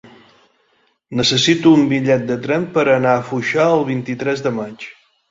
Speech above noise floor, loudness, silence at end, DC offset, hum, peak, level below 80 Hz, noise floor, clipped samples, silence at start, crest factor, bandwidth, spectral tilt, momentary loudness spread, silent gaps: 45 dB; -16 LUFS; 0.4 s; under 0.1%; none; -2 dBFS; -54 dBFS; -61 dBFS; under 0.1%; 1.1 s; 16 dB; 7.8 kHz; -5 dB/octave; 13 LU; none